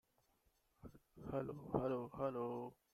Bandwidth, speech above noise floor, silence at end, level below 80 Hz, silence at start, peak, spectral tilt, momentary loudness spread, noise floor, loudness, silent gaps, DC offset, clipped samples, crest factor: 14.5 kHz; 36 dB; 0.2 s; -68 dBFS; 0.85 s; -26 dBFS; -9 dB/octave; 21 LU; -80 dBFS; -44 LUFS; none; under 0.1%; under 0.1%; 20 dB